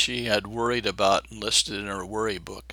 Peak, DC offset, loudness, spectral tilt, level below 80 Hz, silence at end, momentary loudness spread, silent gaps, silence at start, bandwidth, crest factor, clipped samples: -8 dBFS; under 0.1%; -25 LUFS; -2.5 dB/octave; -50 dBFS; 0 s; 9 LU; none; 0 s; 20 kHz; 20 dB; under 0.1%